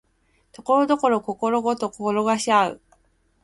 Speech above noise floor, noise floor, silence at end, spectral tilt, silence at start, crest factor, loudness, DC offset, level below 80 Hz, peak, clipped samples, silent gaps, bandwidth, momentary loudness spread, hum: 43 dB; -65 dBFS; 0.7 s; -4.5 dB/octave; 0.6 s; 18 dB; -22 LUFS; under 0.1%; -62 dBFS; -6 dBFS; under 0.1%; none; 11.5 kHz; 6 LU; none